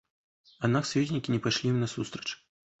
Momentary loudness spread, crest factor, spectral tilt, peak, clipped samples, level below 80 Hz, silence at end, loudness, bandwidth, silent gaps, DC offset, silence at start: 10 LU; 20 dB; -5.5 dB/octave; -10 dBFS; under 0.1%; -64 dBFS; 0.45 s; -30 LUFS; 8.2 kHz; none; under 0.1%; 0.6 s